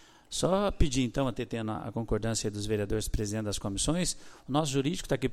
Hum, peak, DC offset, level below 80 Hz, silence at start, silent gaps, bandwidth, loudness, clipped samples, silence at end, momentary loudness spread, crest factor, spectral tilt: none; -10 dBFS; under 0.1%; -40 dBFS; 0.3 s; none; 15.5 kHz; -31 LUFS; under 0.1%; 0 s; 7 LU; 20 dB; -5 dB/octave